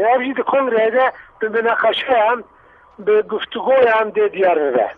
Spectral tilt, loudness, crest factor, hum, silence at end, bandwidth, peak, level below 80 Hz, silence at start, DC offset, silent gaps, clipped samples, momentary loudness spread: -6 dB/octave; -17 LUFS; 12 dB; none; 0.05 s; 4.7 kHz; -4 dBFS; -60 dBFS; 0 s; under 0.1%; none; under 0.1%; 7 LU